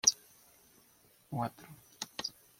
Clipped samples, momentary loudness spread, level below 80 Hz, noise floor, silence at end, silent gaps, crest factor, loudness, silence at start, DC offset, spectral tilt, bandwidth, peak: under 0.1%; 19 LU; -74 dBFS; -66 dBFS; 0.3 s; none; 30 dB; -37 LUFS; 0.05 s; under 0.1%; -1.5 dB/octave; 16.5 kHz; -8 dBFS